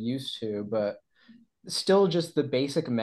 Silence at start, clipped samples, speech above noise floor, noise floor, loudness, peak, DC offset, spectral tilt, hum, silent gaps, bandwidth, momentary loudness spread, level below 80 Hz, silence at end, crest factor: 0 s; under 0.1%; 30 dB; -57 dBFS; -27 LUFS; -12 dBFS; under 0.1%; -5.5 dB/octave; none; none; 12.5 kHz; 10 LU; -72 dBFS; 0 s; 16 dB